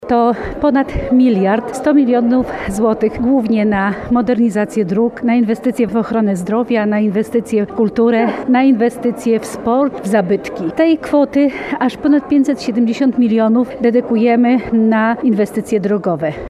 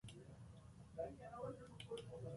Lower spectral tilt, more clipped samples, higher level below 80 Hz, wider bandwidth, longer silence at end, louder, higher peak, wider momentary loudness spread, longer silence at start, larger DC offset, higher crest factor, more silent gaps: about the same, -7 dB/octave vs -6 dB/octave; neither; first, -40 dBFS vs -70 dBFS; about the same, 12.5 kHz vs 11.5 kHz; about the same, 0 s vs 0 s; first, -14 LUFS vs -54 LUFS; first, -2 dBFS vs -36 dBFS; second, 5 LU vs 10 LU; about the same, 0 s vs 0.05 s; neither; second, 12 dB vs 18 dB; neither